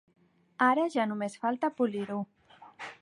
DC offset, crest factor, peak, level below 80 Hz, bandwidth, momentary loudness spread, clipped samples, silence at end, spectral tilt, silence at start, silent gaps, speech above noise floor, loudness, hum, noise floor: under 0.1%; 20 dB; -12 dBFS; -80 dBFS; 11 kHz; 17 LU; under 0.1%; 0.05 s; -6 dB/octave; 0.6 s; none; 21 dB; -30 LUFS; none; -50 dBFS